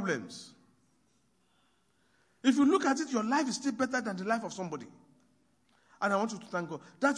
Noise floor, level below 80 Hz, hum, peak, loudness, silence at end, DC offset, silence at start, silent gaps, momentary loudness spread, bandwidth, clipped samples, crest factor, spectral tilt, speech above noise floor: -72 dBFS; -82 dBFS; none; -14 dBFS; -31 LUFS; 0 s; under 0.1%; 0 s; none; 14 LU; 10.5 kHz; under 0.1%; 20 dB; -4.5 dB/octave; 41 dB